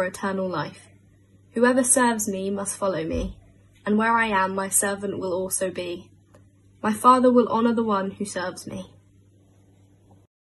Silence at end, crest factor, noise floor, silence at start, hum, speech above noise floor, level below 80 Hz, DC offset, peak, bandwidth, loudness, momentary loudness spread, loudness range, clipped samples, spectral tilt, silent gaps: 1.7 s; 20 dB; -56 dBFS; 0 s; none; 33 dB; -50 dBFS; under 0.1%; -4 dBFS; 12.5 kHz; -23 LUFS; 16 LU; 2 LU; under 0.1%; -4 dB/octave; none